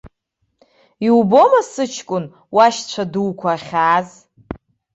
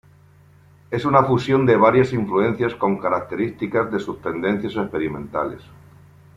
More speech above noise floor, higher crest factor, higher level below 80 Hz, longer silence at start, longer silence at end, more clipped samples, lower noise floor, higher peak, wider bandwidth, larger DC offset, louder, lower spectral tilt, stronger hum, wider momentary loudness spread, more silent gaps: first, 54 dB vs 31 dB; about the same, 16 dB vs 18 dB; about the same, -54 dBFS vs -54 dBFS; second, 0.05 s vs 0.9 s; second, 0.4 s vs 0.75 s; neither; first, -70 dBFS vs -51 dBFS; about the same, -2 dBFS vs -2 dBFS; about the same, 8.2 kHz vs 8 kHz; neither; first, -16 LUFS vs -20 LUFS; second, -5 dB/octave vs -8 dB/octave; neither; first, 23 LU vs 11 LU; neither